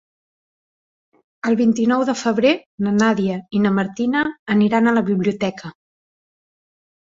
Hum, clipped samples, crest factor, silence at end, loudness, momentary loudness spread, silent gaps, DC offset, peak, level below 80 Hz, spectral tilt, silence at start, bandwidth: none; under 0.1%; 16 dB; 1.4 s; -19 LUFS; 7 LU; 2.66-2.78 s, 4.39-4.46 s; under 0.1%; -4 dBFS; -60 dBFS; -6 dB/octave; 1.45 s; 7.8 kHz